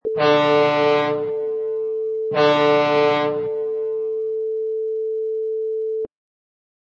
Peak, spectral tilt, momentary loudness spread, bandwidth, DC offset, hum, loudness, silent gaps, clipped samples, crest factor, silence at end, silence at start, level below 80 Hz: -4 dBFS; -6 dB/octave; 8 LU; 7 kHz; under 0.1%; none; -20 LUFS; none; under 0.1%; 16 dB; 0.8 s; 0.05 s; -66 dBFS